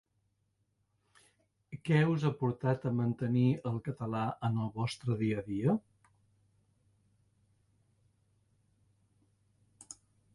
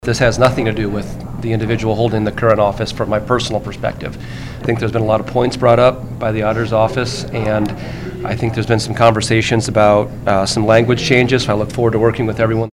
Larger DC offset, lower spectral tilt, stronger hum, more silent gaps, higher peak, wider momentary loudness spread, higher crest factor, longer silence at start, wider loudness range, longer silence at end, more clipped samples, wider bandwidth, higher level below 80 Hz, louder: neither; first, -7.5 dB/octave vs -6 dB/octave; neither; neither; second, -16 dBFS vs 0 dBFS; first, 16 LU vs 10 LU; about the same, 20 dB vs 16 dB; first, 1.7 s vs 0.05 s; first, 7 LU vs 4 LU; first, 0.4 s vs 0.05 s; second, under 0.1% vs 0.1%; second, 11.5 kHz vs 13 kHz; second, -68 dBFS vs -34 dBFS; second, -33 LUFS vs -15 LUFS